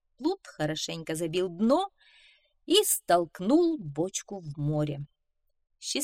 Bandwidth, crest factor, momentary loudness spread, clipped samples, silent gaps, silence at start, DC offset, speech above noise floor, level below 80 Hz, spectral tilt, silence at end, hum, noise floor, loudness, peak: 16 kHz; 20 dB; 12 LU; under 0.1%; none; 0.2 s; under 0.1%; 48 dB; -62 dBFS; -4 dB/octave; 0 s; none; -76 dBFS; -28 LUFS; -10 dBFS